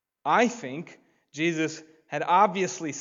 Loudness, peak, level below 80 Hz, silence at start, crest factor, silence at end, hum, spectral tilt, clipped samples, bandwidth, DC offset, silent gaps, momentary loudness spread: -25 LUFS; -8 dBFS; -82 dBFS; 0.25 s; 20 dB; 0 s; none; -4 dB/octave; under 0.1%; 7.8 kHz; under 0.1%; none; 19 LU